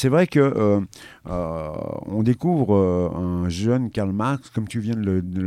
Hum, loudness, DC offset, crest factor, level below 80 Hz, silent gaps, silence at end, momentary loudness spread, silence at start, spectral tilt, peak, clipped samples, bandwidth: none; -22 LUFS; under 0.1%; 16 dB; -46 dBFS; none; 0 s; 11 LU; 0 s; -8 dB/octave; -4 dBFS; under 0.1%; 12.5 kHz